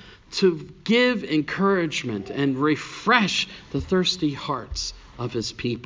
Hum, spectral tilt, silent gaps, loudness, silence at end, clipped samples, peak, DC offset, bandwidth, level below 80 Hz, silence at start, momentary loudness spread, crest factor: none; -4.5 dB/octave; none; -23 LUFS; 0 s; under 0.1%; -4 dBFS; under 0.1%; 7.6 kHz; -46 dBFS; 0.05 s; 11 LU; 20 dB